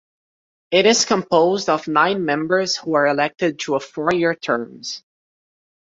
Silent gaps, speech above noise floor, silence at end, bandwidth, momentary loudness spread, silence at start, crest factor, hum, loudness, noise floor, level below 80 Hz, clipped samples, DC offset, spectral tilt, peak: none; over 71 dB; 0.95 s; 7.8 kHz; 9 LU; 0.7 s; 18 dB; none; -18 LUFS; under -90 dBFS; -64 dBFS; under 0.1%; under 0.1%; -3.5 dB/octave; -2 dBFS